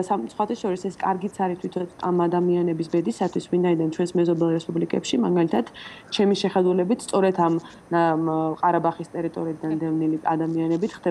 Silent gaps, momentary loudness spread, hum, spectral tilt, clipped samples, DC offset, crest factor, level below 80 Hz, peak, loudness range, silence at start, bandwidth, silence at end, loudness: none; 7 LU; none; -6.5 dB/octave; under 0.1%; under 0.1%; 14 dB; -64 dBFS; -8 dBFS; 2 LU; 0 s; 11.5 kHz; 0 s; -23 LUFS